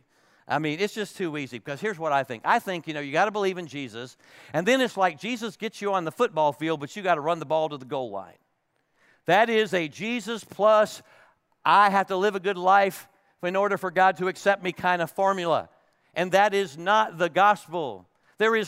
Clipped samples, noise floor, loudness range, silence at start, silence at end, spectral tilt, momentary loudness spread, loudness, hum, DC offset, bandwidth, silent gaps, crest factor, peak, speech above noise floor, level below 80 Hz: under 0.1%; -73 dBFS; 5 LU; 0.5 s; 0 s; -4.5 dB/octave; 13 LU; -25 LUFS; none; under 0.1%; 16 kHz; none; 18 dB; -6 dBFS; 48 dB; -76 dBFS